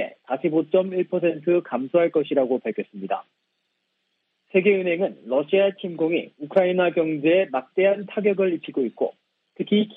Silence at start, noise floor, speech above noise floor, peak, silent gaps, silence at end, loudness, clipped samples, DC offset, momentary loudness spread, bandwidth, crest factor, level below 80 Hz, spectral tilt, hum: 0 s; -75 dBFS; 53 dB; -6 dBFS; none; 0 s; -23 LUFS; under 0.1%; under 0.1%; 9 LU; 4 kHz; 18 dB; -74 dBFS; -9.5 dB/octave; none